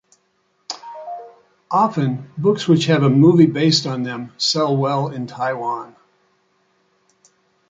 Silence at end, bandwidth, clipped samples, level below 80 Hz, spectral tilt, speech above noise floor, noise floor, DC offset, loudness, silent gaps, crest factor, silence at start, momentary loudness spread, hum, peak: 1.85 s; 9.2 kHz; under 0.1%; -62 dBFS; -6 dB/octave; 48 dB; -65 dBFS; under 0.1%; -17 LUFS; none; 18 dB; 0.7 s; 19 LU; none; -2 dBFS